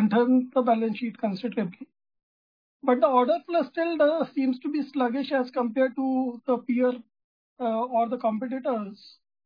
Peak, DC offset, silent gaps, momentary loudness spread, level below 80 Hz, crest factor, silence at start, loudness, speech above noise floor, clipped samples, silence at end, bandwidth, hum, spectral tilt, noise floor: -8 dBFS; under 0.1%; 2.23-2.80 s, 7.24-7.56 s; 8 LU; -78 dBFS; 18 dB; 0 s; -26 LUFS; over 65 dB; under 0.1%; 0.35 s; 5.2 kHz; none; -9 dB/octave; under -90 dBFS